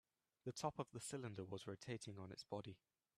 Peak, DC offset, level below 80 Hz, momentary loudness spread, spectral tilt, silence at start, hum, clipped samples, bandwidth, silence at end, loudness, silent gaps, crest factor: -28 dBFS; under 0.1%; -82 dBFS; 8 LU; -5 dB/octave; 0.45 s; none; under 0.1%; 13.5 kHz; 0.4 s; -51 LUFS; none; 22 dB